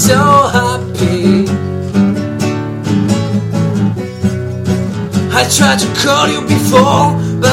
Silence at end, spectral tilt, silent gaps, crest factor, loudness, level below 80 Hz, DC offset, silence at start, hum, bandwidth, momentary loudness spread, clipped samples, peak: 0 s; -5 dB/octave; none; 12 dB; -12 LUFS; -40 dBFS; under 0.1%; 0 s; none; 16.5 kHz; 8 LU; 0.3%; 0 dBFS